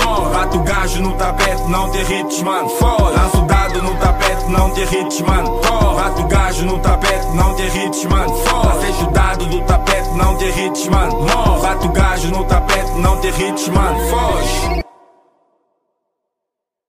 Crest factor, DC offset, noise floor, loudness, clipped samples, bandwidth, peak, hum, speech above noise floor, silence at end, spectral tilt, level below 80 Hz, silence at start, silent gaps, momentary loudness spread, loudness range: 14 dB; under 0.1%; -81 dBFS; -15 LUFS; under 0.1%; 16 kHz; 0 dBFS; none; 67 dB; 2.05 s; -5 dB/octave; -18 dBFS; 0 s; none; 4 LU; 2 LU